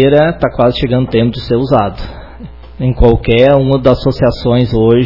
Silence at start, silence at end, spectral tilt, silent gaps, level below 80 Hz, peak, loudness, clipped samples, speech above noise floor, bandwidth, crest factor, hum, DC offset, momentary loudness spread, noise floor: 0 s; 0 s; -9 dB/octave; none; -24 dBFS; 0 dBFS; -11 LUFS; 0.7%; 20 dB; 6 kHz; 10 dB; none; 1%; 10 LU; -30 dBFS